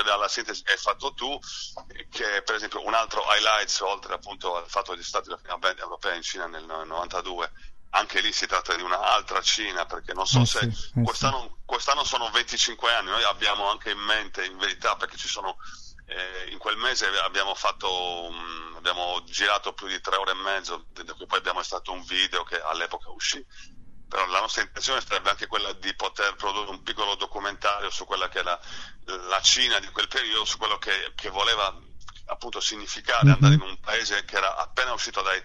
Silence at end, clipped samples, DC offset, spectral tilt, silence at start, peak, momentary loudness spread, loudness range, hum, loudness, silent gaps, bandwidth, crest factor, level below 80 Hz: 0 s; under 0.1%; under 0.1%; -3 dB/octave; 0 s; -4 dBFS; 12 LU; 5 LU; none; -25 LUFS; none; 11.5 kHz; 22 dB; -48 dBFS